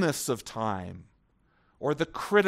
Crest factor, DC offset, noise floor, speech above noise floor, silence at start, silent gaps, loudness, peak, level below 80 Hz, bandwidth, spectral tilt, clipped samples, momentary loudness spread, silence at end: 22 dB; under 0.1%; -67 dBFS; 39 dB; 0 s; none; -31 LUFS; -8 dBFS; -62 dBFS; 16 kHz; -4.5 dB/octave; under 0.1%; 13 LU; 0 s